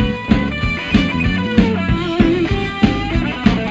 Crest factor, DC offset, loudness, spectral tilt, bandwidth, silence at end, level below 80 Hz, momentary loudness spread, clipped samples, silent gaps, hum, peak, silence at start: 16 dB; under 0.1%; -16 LUFS; -7 dB/octave; 8 kHz; 0 s; -26 dBFS; 4 LU; under 0.1%; none; none; 0 dBFS; 0 s